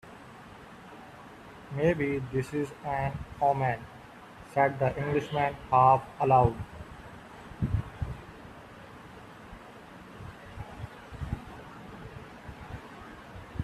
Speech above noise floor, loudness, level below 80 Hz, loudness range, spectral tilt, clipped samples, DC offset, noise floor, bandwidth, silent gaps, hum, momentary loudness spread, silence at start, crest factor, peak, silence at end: 22 dB; -29 LUFS; -50 dBFS; 17 LU; -7.5 dB/octave; under 0.1%; under 0.1%; -49 dBFS; 13.5 kHz; none; none; 24 LU; 0.05 s; 22 dB; -10 dBFS; 0 s